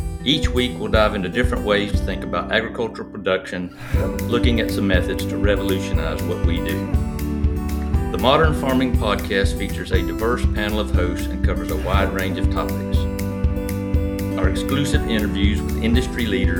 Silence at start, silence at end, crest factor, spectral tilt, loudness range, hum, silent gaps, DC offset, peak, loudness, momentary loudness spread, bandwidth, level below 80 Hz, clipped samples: 0 s; 0 s; 20 dB; -6 dB/octave; 2 LU; none; none; under 0.1%; 0 dBFS; -21 LUFS; 5 LU; 19.5 kHz; -26 dBFS; under 0.1%